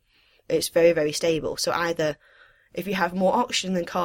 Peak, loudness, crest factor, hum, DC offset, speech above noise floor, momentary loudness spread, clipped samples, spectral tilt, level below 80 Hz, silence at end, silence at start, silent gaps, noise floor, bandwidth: -8 dBFS; -24 LUFS; 18 dB; none; under 0.1%; 35 dB; 9 LU; under 0.1%; -4 dB/octave; -56 dBFS; 0 s; 0.5 s; none; -59 dBFS; 16.5 kHz